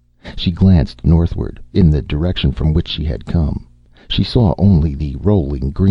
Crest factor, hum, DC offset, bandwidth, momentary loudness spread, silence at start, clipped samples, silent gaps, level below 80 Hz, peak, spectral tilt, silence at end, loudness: 14 dB; none; under 0.1%; 6 kHz; 9 LU; 0.25 s; under 0.1%; none; -24 dBFS; -2 dBFS; -9 dB/octave; 0 s; -16 LUFS